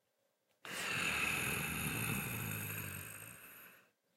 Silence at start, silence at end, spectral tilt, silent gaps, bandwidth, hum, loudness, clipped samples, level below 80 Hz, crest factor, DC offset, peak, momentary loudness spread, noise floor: 0.65 s; 0.35 s; -3 dB/octave; none; 16 kHz; none; -38 LUFS; under 0.1%; -62 dBFS; 18 dB; under 0.1%; -24 dBFS; 19 LU; -81 dBFS